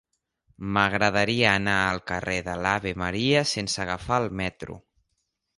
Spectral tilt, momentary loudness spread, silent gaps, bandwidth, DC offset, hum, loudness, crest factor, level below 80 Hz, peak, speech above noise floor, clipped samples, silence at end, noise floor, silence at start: -4 dB/octave; 10 LU; none; 11.5 kHz; under 0.1%; none; -24 LUFS; 22 dB; -48 dBFS; -4 dBFS; 52 dB; under 0.1%; 0.8 s; -77 dBFS; 0.6 s